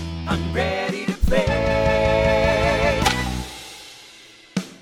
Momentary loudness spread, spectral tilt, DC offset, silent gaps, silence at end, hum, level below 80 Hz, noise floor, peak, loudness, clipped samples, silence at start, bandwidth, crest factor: 17 LU; -5 dB/octave; under 0.1%; none; 0.05 s; none; -30 dBFS; -46 dBFS; -4 dBFS; -21 LUFS; under 0.1%; 0 s; 17 kHz; 16 dB